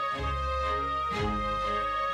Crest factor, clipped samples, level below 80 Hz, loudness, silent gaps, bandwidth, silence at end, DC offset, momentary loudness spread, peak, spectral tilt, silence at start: 12 dB; under 0.1%; -38 dBFS; -30 LUFS; none; 14 kHz; 0 s; under 0.1%; 1 LU; -18 dBFS; -5.5 dB/octave; 0 s